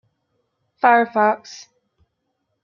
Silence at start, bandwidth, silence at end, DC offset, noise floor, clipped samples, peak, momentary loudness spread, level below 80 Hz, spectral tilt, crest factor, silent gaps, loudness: 0.85 s; 7.2 kHz; 1.05 s; under 0.1%; -74 dBFS; under 0.1%; -2 dBFS; 23 LU; -74 dBFS; -4.5 dB/octave; 20 dB; none; -17 LUFS